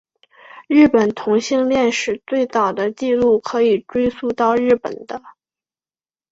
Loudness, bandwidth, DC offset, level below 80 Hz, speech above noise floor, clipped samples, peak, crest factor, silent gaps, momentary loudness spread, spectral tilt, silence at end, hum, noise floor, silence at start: -17 LUFS; 8 kHz; under 0.1%; -52 dBFS; over 73 dB; under 0.1%; -2 dBFS; 16 dB; none; 8 LU; -5 dB/octave; 1 s; none; under -90 dBFS; 0.55 s